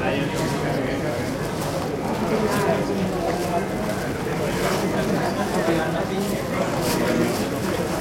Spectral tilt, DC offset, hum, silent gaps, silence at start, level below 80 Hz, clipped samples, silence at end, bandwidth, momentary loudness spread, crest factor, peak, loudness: -5.5 dB/octave; under 0.1%; none; none; 0 s; -44 dBFS; under 0.1%; 0 s; 16.5 kHz; 4 LU; 14 dB; -8 dBFS; -23 LUFS